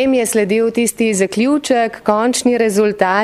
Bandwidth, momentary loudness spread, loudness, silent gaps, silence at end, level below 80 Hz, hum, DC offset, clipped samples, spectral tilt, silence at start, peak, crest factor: 15.5 kHz; 2 LU; -15 LUFS; none; 0 s; -54 dBFS; none; under 0.1%; under 0.1%; -4 dB/octave; 0 s; 0 dBFS; 14 dB